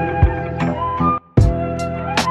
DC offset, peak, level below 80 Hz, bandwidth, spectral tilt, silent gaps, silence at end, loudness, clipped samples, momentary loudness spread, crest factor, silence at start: under 0.1%; -4 dBFS; -24 dBFS; 12.5 kHz; -6.5 dB/octave; none; 0 s; -19 LUFS; under 0.1%; 6 LU; 14 dB; 0 s